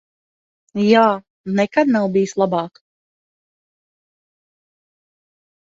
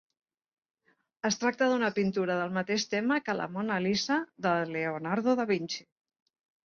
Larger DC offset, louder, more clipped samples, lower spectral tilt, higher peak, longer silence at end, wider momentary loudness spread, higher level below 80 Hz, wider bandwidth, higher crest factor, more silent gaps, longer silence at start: neither; first, -17 LUFS vs -30 LUFS; neither; first, -6 dB/octave vs -4.5 dB/octave; first, -2 dBFS vs -14 dBFS; first, 3.1 s vs 0.85 s; first, 13 LU vs 5 LU; first, -66 dBFS vs -72 dBFS; about the same, 7.8 kHz vs 7.2 kHz; about the same, 20 dB vs 18 dB; first, 1.30-1.44 s vs none; second, 0.75 s vs 1.25 s